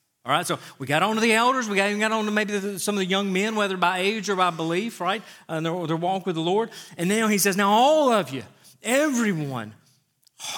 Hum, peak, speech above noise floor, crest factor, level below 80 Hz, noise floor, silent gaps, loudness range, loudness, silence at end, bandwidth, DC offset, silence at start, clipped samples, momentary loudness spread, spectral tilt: none; -6 dBFS; 40 dB; 18 dB; -80 dBFS; -63 dBFS; none; 3 LU; -23 LUFS; 0 s; 19 kHz; under 0.1%; 0.25 s; under 0.1%; 12 LU; -4 dB/octave